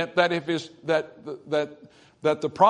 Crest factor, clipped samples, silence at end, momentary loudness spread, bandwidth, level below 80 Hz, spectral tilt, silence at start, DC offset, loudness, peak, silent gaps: 20 dB; under 0.1%; 0 s; 12 LU; 10.5 kHz; -72 dBFS; -5.5 dB/octave; 0 s; under 0.1%; -27 LUFS; -4 dBFS; none